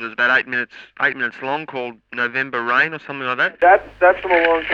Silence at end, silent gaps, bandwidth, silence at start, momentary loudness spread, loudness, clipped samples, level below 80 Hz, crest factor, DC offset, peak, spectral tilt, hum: 0 s; none; 7 kHz; 0 s; 12 LU; -18 LUFS; under 0.1%; -54 dBFS; 18 dB; under 0.1%; 0 dBFS; -5.5 dB/octave; none